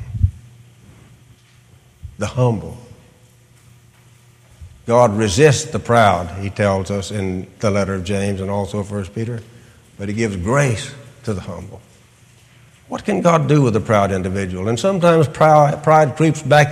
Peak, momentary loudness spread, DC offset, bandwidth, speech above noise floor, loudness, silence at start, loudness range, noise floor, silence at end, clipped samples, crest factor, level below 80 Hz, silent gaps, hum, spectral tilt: 0 dBFS; 14 LU; under 0.1%; 14.5 kHz; 33 dB; -17 LUFS; 0 s; 12 LU; -49 dBFS; 0 s; under 0.1%; 18 dB; -40 dBFS; none; none; -6 dB/octave